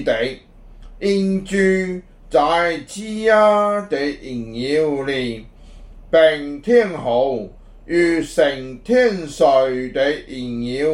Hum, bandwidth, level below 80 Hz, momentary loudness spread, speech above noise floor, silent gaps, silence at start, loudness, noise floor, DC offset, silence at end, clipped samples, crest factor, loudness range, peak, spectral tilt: none; 12 kHz; -44 dBFS; 13 LU; 22 dB; none; 0 s; -18 LUFS; -40 dBFS; under 0.1%; 0 s; under 0.1%; 16 dB; 2 LU; -2 dBFS; -5.5 dB/octave